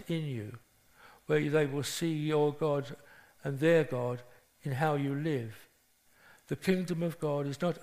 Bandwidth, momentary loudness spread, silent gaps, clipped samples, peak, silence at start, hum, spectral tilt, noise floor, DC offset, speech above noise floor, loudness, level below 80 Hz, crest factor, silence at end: 15.5 kHz; 15 LU; none; under 0.1%; -14 dBFS; 0 s; none; -6 dB/octave; -67 dBFS; under 0.1%; 36 dB; -32 LUFS; -68 dBFS; 20 dB; 0 s